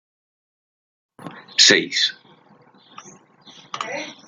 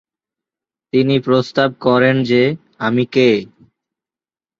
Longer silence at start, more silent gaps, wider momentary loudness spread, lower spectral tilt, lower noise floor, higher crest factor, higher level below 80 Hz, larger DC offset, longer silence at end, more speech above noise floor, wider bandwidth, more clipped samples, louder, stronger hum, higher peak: first, 1.2 s vs 0.95 s; neither; first, 25 LU vs 6 LU; second, -0.5 dB/octave vs -7 dB/octave; second, -53 dBFS vs under -90 dBFS; first, 24 dB vs 16 dB; second, -76 dBFS vs -58 dBFS; neither; second, 0.15 s vs 1.15 s; second, 34 dB vs over 76 dB; first, 13 kHz vs 7.2 kHz; neither; about the same, -16 LUFS vs -15 LUFS; neither; about the same, 0 dBFS vs -2 dBFS